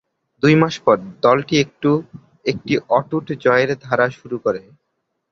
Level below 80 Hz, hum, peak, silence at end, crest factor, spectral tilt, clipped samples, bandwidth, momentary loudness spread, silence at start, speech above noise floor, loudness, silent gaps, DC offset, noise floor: -56 dBFS; none; -2 dBFS; 0.7 s; 18 dB; -6 dB/octave; under 0.1%; 7.2 kHz; 9 LU; 0.45 s; 56 dB; -18 LUFS; none; under 0.1%; -73 dBFS